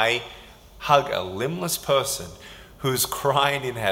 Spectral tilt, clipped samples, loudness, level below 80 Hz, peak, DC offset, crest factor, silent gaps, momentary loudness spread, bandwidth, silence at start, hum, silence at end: -3 dB/octave; under 0.1%; -23 LUFS; -52 dBFS; -4 dBFS; under 0.1%; 22 dB; none; 19 LU; 17 kHz; 0 s; none; 0 s